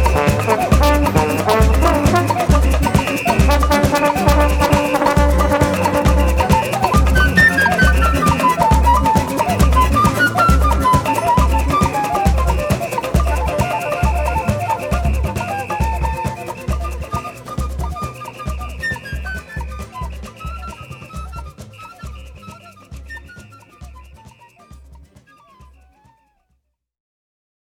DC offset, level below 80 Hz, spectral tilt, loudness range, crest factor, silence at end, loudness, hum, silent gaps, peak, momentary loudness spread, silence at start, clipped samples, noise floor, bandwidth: under 0.1%; -20 dBFS; -5.5 dB/octave; 18 LU; 16 dB; 3 s; -16 LUFS; none; none; 0 dBFS; 17 LU; 0 s; under 0.1%; -67 dBFS; 18 kHz